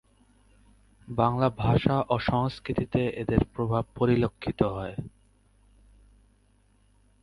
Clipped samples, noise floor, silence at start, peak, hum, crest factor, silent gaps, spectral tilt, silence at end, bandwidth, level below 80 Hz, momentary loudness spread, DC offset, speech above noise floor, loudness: under 0.1%; -64 dBFS; 1.1 s; -6 dBFS; 50 Hz at -50 dBFS; 24 dB; none; -9 dB/octave; 2.15 s; 11 kHz; -46 dBFS; 10 LU; under 0.1%; 37 dB; -27 LUFS